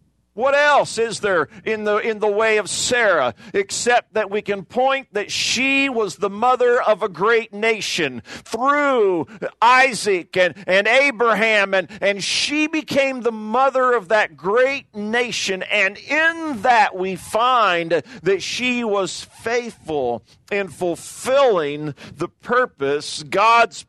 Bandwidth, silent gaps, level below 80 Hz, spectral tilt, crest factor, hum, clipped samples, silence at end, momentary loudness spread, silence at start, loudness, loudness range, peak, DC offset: 12.5 kHz; none; -62 dBFS; -3 dB/octave; 16 dB; none; under 0.1%; 0.05 s; 10 LU; 0.35 s; -18 LUFS; 5 LU; -2 dBFS; under 0.1%